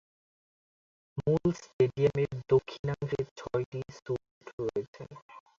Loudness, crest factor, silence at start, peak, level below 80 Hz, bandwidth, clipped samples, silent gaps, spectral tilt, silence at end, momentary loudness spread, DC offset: -32 LUFS; 20 dB; 1.15 s; -12 dBFS; -60 dBFS; 7.4 kHz; under 0.1%; 1.73-1.79 s, 2.79-2.84 s, 3.31-3.36 s, 3.66-3.72 s, 4.31-4.41 s, 4.53-4.58 s, 4.88-4.93 s, 5.22-5.29 s; -8 dB/octave; 0.2 s; 17 LU; under 0.1%